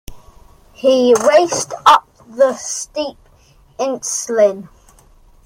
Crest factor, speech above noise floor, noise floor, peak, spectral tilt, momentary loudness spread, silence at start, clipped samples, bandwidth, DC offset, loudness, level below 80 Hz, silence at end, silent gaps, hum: 16 dB; 35 dB; -49 dBFS; 0 dBFS; -2.5 dB/octave; 13 LU; 0.1 s; under 0.1%; 16.5 kHz; under 0.1%; -15 LUFS; -48 dBFS; 0.85 s; none; none